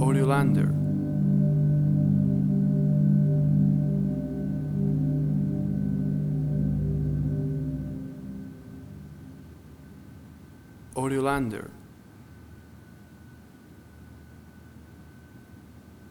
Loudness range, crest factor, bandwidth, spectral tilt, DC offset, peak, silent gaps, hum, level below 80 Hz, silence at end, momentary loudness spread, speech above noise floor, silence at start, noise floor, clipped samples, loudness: 13 LU; 18 dB; 12 kHz; -9 dB/octave; under 0.1%; -10 dBFS; none; none; -46 dBFS; 0 s; 22 LU; 25 dB; 0 s; -50 dBFS; under 0.1%; -25 LUFS